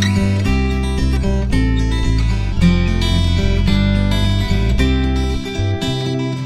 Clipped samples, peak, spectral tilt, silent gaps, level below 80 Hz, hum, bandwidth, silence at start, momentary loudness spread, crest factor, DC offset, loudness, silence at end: under 0.1%; -2 dBFS; -6.5 dB/octave; none; -18 dBFS; none; 12.5 kHz; 0 s; 4 LU; 14 dB; under 0.1%; -17 LUFS; 0 s